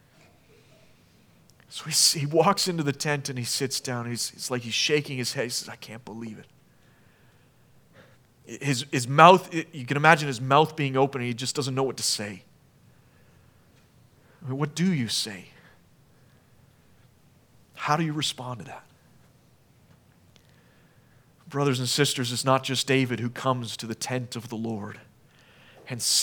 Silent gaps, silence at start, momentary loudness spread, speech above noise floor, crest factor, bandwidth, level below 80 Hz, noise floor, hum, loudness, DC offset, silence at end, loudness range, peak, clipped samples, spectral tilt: none; 1.7 s; 19 LU; 34 dB; 28 dB; over 20 kHz; -72 dBFS; -59 dBFS; none; -25 LUFS; under 0.1%; 0 s; 12 LU; 0 dBFS; under 0.1%; -3.5 dB/octave